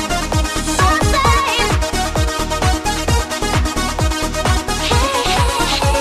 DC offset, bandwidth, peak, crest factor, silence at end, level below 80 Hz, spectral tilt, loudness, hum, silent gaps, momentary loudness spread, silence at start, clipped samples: under 0.1%; 14 kHz; 0 dBFS; 16 dB; 0 s; -22 dBFS; -4 dB/octave; -16 LUFS; none; none; 5 LU; 0 s; under 0.1%